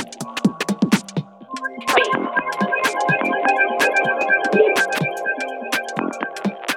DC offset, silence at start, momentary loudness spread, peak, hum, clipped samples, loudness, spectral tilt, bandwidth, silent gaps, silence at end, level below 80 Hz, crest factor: under 0.1%; 0 s; 10 LU; -2 dBFS; none; under 0.1%; -19 LUFS; -4.5 dB/octave; 18 kHz; none; 0 s; -68 dBFS; 18 dB